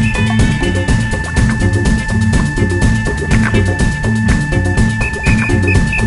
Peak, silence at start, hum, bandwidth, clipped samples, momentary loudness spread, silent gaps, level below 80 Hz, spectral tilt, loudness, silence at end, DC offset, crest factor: 0 dBFS; 0 s; none; 11.5 kHz; under 0.1%; 3 LU; none; -18 dBFS; -6 dB/octave; -14 LUFS; 0 s; under 0.1%; 12 dB